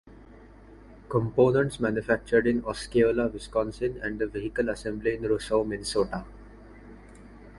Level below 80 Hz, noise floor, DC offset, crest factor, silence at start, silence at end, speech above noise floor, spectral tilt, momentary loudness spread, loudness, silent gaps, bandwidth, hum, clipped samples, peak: -48 dBFS; -50 dBFS; under 0.1%; 20 dB; 0.05 s; 0 s; 24 dB; -6 dB/octave; 8 LU; -27 LUFS; none; 11.5 kHz; none; under 0.1%; -8 dBFS